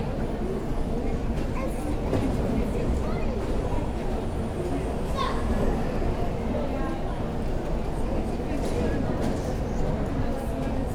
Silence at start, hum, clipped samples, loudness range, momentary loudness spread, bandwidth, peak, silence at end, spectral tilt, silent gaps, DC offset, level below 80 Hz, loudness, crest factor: 0 s; none; under 0.1%; 1 LU; 3 LU; 13.5 kHz; -12 dBFS; 0 s; -7.5 dB/octave; none; under 0.1%; -30 dBFS; -29 LUFS; 14 dB